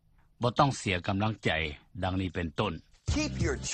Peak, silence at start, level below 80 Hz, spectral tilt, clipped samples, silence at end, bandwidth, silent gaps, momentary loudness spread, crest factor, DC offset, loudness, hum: -10 dBFS; 0.4 s; -44 dBFS; -5 dB/octave; under 0.1%; 0 s; 9.4 kHz; none; 7 LU; 22 dB; under 0.1%; -31 LUFS; none